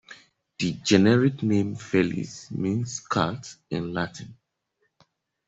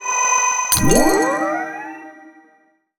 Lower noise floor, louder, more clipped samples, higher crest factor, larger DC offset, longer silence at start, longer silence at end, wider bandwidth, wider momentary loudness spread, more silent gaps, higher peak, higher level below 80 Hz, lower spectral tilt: first, -74 dBFS vs -58 dBFS; second, -25 LUFS vs -16 LUFS; neither; about the same, 22 dB vs 18 dB; neither; about the same, 0.1 s vs 0 s; first, 1.15 s vs 0.7 s; second, 8.2 kHz vs over 20 kHz; second, 14 LU vs 17 LU; neither; second, -4 dBFS vs 0 dBFS; second, -60 dBFS vs -34 dBFS; first, -5.5 dB/octave vs -3 dB/octave